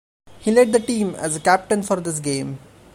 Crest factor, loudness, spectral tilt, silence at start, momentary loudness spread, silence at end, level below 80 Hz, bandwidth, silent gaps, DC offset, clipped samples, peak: 18 dB; -20 LUFS; -4.5 dB/octave; 0.3 s; 11 LU; 0.35 s; -54 dBFS; 16 kHz; none; under 0.1%; under 0.1%; -2 dBFS